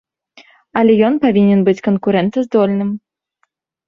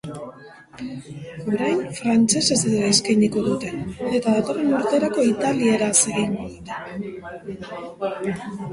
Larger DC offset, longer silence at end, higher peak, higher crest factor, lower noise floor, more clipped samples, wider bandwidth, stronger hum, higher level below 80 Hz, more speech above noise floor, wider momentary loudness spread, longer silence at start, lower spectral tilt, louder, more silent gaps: neither; first, 0.9 s vs 0 s; about the same, -2 dBFS vs -4 dBFS; about the same, 14 dB vs 18 dB; first, -66 dBFS vs -44 dBFS; neither; second, 6.8 kHz vs 11.5 kHz; neither; about the same, -56 dBFS vs -54 dBFS; first, 53 dB vs 22 dB; second, 10 LU vs 17 LU; first, 0.75 s vs 0.05 s; first, -8.5 dB/octave vs -4 dB/octave; first, -14 LUFS vs -21 LUFS; neither